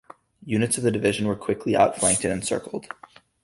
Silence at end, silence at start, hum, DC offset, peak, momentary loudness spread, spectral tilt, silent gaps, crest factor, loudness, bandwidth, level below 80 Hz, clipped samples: 0.6 s; 0.45 s; none; under 0.1%; -6 dBFS; 15 LU; -4 dB/octave; none; 20 dB; -23 LUFS; 11.5 kHz; -54 dBFS; under 0.1%